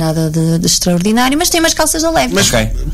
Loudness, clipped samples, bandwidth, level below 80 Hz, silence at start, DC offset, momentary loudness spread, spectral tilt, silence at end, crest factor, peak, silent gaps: -12 LUFS; under 0.1%; 16 kHz; -26 dBFS; 0 s; under 0.1%; 3 LU; -3.5 dB/octave; 0 s; 10 dB; -2 dBFS; none